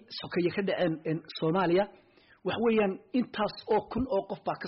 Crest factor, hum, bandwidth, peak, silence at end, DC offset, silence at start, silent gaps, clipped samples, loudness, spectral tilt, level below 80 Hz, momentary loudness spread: 12 dB; none; 5.8 kHz; -18 dBFS; 0 s; under 0.1%; 0.1 s; none; under 0.1%; -30 LUFS; -5 dB/octave; -58 dBFS; 8 LU